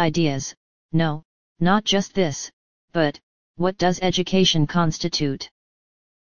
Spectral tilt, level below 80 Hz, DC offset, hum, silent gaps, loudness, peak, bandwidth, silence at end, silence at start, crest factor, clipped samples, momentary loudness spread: -5 dB/octave; -48 dBFS; 2%; none; 0.57-0.89 s, 1.25-1.55 s, 2.53-2.88 s, 3.23-3.54 s; -22 LUFS; -4 dBFS; 7.2 kHz; 0.7 s; 0 s; 18 dB; under 0.1%; 14 LU